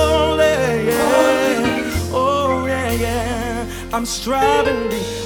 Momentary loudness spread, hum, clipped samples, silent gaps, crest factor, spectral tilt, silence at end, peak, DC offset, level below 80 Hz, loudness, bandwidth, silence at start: 8 LU; none; under 0.1%; none; 14 dB; -4.5 dB/octave; 0 s; -2 dBFS; under 0.1%; -34 dBFS; -17 LUFS; over 20 kHz; 0 s